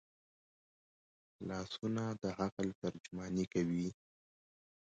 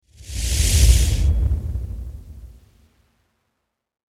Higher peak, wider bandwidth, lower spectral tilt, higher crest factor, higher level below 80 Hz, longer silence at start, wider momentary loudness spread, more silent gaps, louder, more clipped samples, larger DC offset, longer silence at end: second, -22 dBFS vs -2 dBFS; second, 8.8 kHz vs 16 kHz; first, -6.5 dB/octave vs -3.5 dB/octave; about the same, 20 dB vs 20 dB; second, -66 dBFS vs -22 dBFS; first, 1.4 s vs 0.2 s; second, 8 LU vs 19 LU; first, 2.52-2.57 s, 2.75-2.82 s, 3.00-3.04 s vs none; second, -40 LUFS vs -20 LUFS; neither; neither; second, 1 s vs 1.65 s